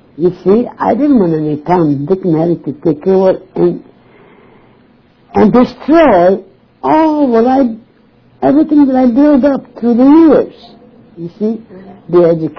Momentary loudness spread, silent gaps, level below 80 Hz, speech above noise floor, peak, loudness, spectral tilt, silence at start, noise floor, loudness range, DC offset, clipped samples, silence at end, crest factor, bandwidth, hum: 11 LU; none; -44 dBFS; 37 dB; 0 dBFS; -10 LUFS; -9.5 dB/octave; 0.2 s; -47 dBFS; 4 LU; under 0.1%; under 0.1%; 0.05 s; 10 dB; 5.4 kHz; none